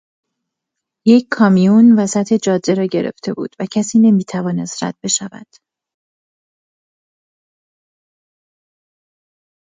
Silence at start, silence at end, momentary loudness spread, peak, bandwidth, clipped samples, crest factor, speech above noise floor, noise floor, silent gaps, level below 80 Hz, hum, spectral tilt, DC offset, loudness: 1.05 s; 4.35 s; 13 LU; 0 dBFS; 9.6 kHz; under 0.1%; 16 dB; 66 dB; -80 dBFS; none; -64 dBFS; none; -5.5 dB/octave; under 0.1%; -14 LUFS